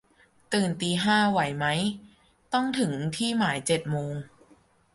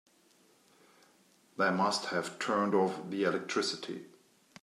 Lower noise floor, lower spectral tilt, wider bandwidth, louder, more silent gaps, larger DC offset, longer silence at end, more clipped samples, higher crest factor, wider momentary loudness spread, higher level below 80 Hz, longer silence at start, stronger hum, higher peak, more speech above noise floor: second, -61 dBFS vs -66 dBFS; about the same, -4.5 dB/octave vs -4 dB/octave; second, 11.5 kHz vs 14 kHz; first, -26 LUFS vs -32 LUFS; neither; neither; first, 0.7 s vs 0.55 s; neither; about the same, 18 dB vs 18 dB; second, 9 LU vs 12 LU; first, -62 dBFS vs -86 dBFS; second, 0.5 s vs 1.6 s; neither; first, -10 dBFS vs -16 dBFS; about the same, 34 dB vs 34 dB